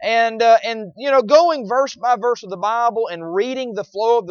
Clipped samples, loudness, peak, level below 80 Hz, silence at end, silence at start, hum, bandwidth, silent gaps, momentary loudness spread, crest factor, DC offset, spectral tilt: under 0.1%; -18 LUFS; -2 dBFS; -68 dBFS; 0 s; 0 s; none; 7 kHz; none; 10 LU; 16 dB; under 0.1%; -4 dB/octave